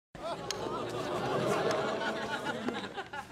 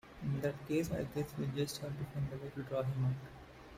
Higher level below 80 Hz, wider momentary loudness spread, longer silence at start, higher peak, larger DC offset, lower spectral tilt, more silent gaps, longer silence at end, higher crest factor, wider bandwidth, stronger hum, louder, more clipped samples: about the same, -64 dBFS vs -60 dBFS; about the same, 9 LU vs 8 LU; about the same, 0.15 s vs 0.05 s; first, -14 dBFS vs -24 dBFS; neither; second, -4.5 dB/octave vs -6.5 dB/octave; neither; about the same, 0 s vs 0 s; about the same, 20 dB vs 16 dB; about the same, 16 kHz vs 16 kHz; neither; first, -34 LUFS vs -39 LUFS; neither